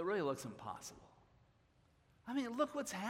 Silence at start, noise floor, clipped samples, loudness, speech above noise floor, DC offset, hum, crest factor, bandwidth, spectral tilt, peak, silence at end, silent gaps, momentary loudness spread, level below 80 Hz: 0 s; -72 dBFS; under 0.1%; -42 LUFS; 31 dB; under 0.1%; none; 20 dB; 16 kHz; -4.5 dB/octave; -24 dBFS; 0 s; none; 13 LU; -76 dBFS